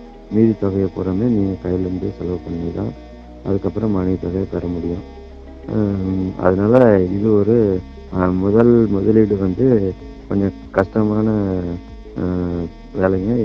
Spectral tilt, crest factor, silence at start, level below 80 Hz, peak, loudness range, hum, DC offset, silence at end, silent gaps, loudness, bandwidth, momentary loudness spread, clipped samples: -10.5 dB/octave; 18 dB; 0 s; -38 dBFS; 0 dBFS; 8 LU; none; under 0.1%; 0 s; none; -18 LUFS; 6.4 kHz; 14 LU; under 0.1%